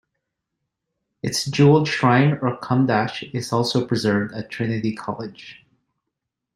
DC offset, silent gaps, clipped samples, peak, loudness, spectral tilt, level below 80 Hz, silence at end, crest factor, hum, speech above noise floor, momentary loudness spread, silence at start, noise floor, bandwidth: under 0.1%; none; under 0.1%; -2 dBFS; -21 LUFS; -6 dB/octave; -60 dBFS; 1.05 s; 20 dB; none; 61 dB; 14 LU; 1.25 s; -81 dBFS; 15 kHz